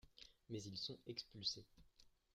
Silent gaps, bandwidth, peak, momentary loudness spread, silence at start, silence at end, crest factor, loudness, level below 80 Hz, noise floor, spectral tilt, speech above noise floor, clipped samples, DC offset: none; 15.5 kHz; -28 dBFS; 13 LU; 0.05 s; 0.25 s; 24 dB; -48 LUFS; -76 dBFS; -72 dBFS; -4 dB/octave; 22 dB; under 0.1%; under 0.1%